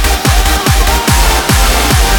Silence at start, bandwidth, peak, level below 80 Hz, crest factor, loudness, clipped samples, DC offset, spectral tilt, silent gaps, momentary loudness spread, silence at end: 0 s; 18.5 kHz; 0 dBFS; -12 dBFS; 8 dB; -10 LUFS; under 0.1%; under 0.1%; -3.5 dB/octave; none; 1 LU; 0 s